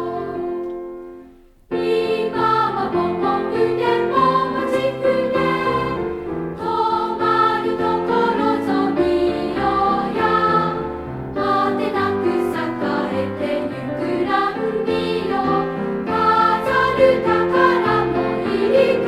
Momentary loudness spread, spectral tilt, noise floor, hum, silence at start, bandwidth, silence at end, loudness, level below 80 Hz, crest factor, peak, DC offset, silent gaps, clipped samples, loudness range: 10 LU; -7 dB/octave; -46 dBFS; none; 0 s; 13 kHz; 0 s; -19 LUFS; -46 dBFS; 18 dB; -2 dBFS; under 0.1%; none; under 0.1%; 4 LU